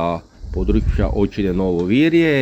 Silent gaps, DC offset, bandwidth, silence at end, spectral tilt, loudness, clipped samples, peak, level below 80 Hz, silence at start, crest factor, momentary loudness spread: none; under 0.1%; 8.2 kHz; 0 s; -8 dB/octave; -18 LUFS; under 0.1%; -4 dBFS; -26 dBFS; 0 s; 12 dB; 10 LU